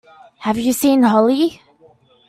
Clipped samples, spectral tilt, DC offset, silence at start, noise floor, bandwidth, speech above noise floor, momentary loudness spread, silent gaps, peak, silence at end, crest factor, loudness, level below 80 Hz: under 0.1%; -4.5 dB/octave; under 0.1%; 0.4 s; -51 dBFS; 15 kHz; 37 dB; 9 LU; none; -4 dBFS; 0.75 s; 14 dB; -16 LUFS; -56 dBFS